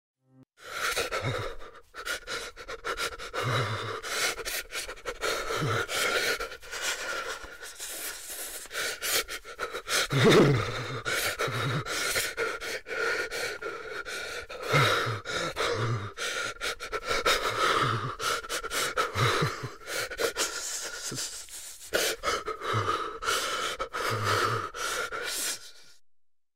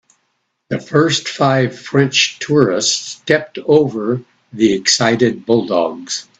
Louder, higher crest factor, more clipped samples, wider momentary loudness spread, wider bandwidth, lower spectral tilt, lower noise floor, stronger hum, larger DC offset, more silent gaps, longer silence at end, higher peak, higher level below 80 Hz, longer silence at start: second, -29 LUFS vs -15 LUFS; about the same, 18 dB vs 16 dB; neither; first, 11 LU vs 8 LU; first, 16 kHz vs 9.2 kHz; about the same, -3 dB/octave vs -4 dB/octave; second, -63 dBFS vs -68 dBFS; neither; first, 0.2% vs under 0.1%; neither; second, 0 s vs 0.15 s; second, -14 dBFS vs 0 dBFS; about the same, -52 dBFS vs -56 dBFS; second, 0.15 s vs 0.7 s